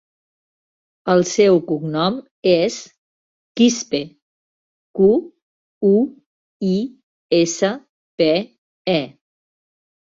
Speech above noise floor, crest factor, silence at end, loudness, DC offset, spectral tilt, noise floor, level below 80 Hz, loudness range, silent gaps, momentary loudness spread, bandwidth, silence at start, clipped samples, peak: over 73 dB; 18 dB; 1.05 s; -18 LUFS; under 0.1%; -5 dB/octave; under -90 dBFS; -60 dBFS; 3 LU; 2.31-2.42 s, 2.98-3.55 s, 4.22-4.94 s, 5.42-5.81 s, 6.26-6.60 s, 7.03-7.29 s, 7.89-8.18 s, 8.58-8.85 s; 16 LU; 7.8 kHz; 1.05 s; under 0.1%; -2 dBFS